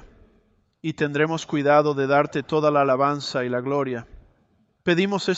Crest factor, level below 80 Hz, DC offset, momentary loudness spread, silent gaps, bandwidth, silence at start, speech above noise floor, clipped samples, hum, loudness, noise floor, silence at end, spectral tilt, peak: 18 dB; -58 dBFS; under 0.1%; 10 LU; none; 8.2 kHz; 0.05 s; 43 dB; under 0.1%; none; -22 LUFS; -64 dBFS; 0 s; -6 dB/octave; -4 dBFS